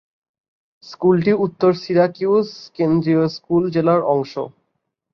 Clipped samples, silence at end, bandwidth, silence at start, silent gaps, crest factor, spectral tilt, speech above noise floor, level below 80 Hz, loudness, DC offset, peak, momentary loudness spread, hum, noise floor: under 0.1%; 0.65 s; 6.4 kHz; 0.85 s; none; 16 dB; -8.5 dB/octave; 57 dB; -58 dBFS; -18 LUFS; under 0.1%; -2 dBFS; 8 LU; none; -74 dBFS